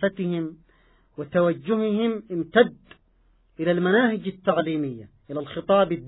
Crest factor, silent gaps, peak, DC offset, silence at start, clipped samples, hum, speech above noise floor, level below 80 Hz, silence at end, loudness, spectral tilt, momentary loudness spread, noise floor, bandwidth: 20 dB; none; -4 dBFS; under 0.1%; 0 s; under 0.1%; none; 38 dB; -60 dBFS; 0 s; -24 LUFS; -11 dB/octave; 14 LU; -61 dBFS; 4.1 kHz